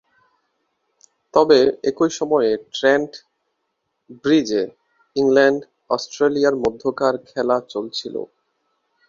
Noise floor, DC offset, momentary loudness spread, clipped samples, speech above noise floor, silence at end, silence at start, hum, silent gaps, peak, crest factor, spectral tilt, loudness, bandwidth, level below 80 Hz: -74 dBFS; under 0.1%; 12 LU; under 0.1%; 56 dB; 0.85 s; 1.35 s; none; none; 0 dBFS; 20 dB; -4.5 dB/octave; -19 LUFS; 7.4 kHz; -60 dBFS